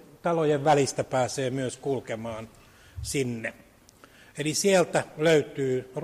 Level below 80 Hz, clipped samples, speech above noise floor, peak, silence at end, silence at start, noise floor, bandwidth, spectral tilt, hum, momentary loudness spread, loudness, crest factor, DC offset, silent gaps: -56 dBFS; under 0.1%; 29 dB; -10 dBFS; 0 s; 0.25 s; -55 dBFS; 15.5 kHz; -4.5 dB/octave; none; 15 LU; -26 LUFS; 16 dB; under 0.1%; none